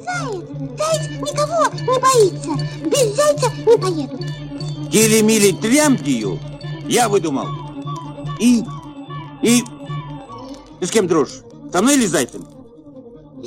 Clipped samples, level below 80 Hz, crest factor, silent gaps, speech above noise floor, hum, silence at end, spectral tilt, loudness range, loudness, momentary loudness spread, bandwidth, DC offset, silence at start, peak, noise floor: under 0.1%; -50 dBFS; 18 dB; none; 23 dB; none; 0 s; -4.5 dB/octave; 5 LU; -17 LUFS; 16 LU; 16.5 kHz; under 0.1%; 0 s; 0 dBFS; -39 dBFS